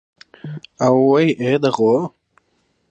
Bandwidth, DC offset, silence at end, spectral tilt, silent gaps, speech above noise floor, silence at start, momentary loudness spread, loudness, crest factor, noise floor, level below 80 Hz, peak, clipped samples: 8.4 kHz; under 0.1%; 0.8 s; -7 dB/octave; none; 49 dB; 0.45 s; 20 LU; -16 LUFS; 14 dB; -65 dBFS; -66 dBFS; -4 dBFS; under 0.1%